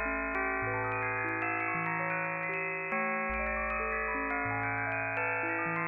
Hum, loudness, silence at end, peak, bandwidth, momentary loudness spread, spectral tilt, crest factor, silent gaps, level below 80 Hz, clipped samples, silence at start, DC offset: none; -32 LUFS; 0 s; -18 dBFS; 5.2 kHz; 1 LU; -9.5 dB/octave; 14 dB; none; -52 dBFS; under 0.1%; 0 s; under 0.1%